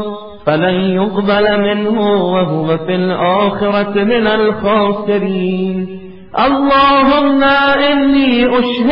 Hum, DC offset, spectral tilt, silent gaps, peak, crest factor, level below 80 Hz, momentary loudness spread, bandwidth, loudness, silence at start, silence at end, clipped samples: none; 1%; -9 dB/octave; none; 0 dBFS; 12 dB; -40 dBFS; 7 LU; 5.6 kHz; -12 LUFS; 0 s; 0 s; under 0.1%